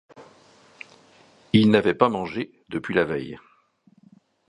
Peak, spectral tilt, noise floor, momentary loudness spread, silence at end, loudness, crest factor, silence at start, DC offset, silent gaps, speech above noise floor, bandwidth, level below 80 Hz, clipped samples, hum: -2 dBFS; -7.5 dB/octave; -60 dBFS; 26 LU; 1.1 s; -22 LUFS; 24 dB; 0.15 s; under 0.1%; none; 38 dB; 10 kHz; -58 dBFS; under 0.1%; none